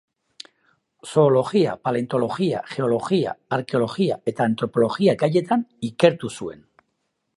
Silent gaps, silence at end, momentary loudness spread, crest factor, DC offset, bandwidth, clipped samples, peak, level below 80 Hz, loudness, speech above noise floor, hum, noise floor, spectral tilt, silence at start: none; 0.85 s; 10 LU; 20 dB; under 0.1%; 11.5 kHz; under 0.1%; -2 dBFS; -64 dBFS; -22 LUFS; 53 dB; none; -74 dBFS; -6.5 dB/octave; 1.05 s